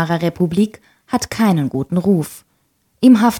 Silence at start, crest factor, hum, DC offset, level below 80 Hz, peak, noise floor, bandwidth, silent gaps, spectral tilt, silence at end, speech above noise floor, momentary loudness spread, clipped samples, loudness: 0 s; 14 dB; none; under 0.1%; -52 dBFS; -2 dBFS; -63 dBFS; 17.5 kHz; none; -6.5 dB/octave; 0 s; 47 dB; 9 LU; under 0.1%; -17 LUFS